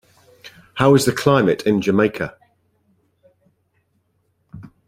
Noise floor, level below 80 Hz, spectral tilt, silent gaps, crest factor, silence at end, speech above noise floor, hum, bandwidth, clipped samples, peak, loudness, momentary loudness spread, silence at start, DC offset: -67 dBFS; -54 dBFS; -6 dB/octave; none; 20 dB; 0.2 s; 50 dB; none; 16 kHz; under 0.1%; -2 dBFS; -17 LUFS; 14 LU; 0.45 s; under 0.1%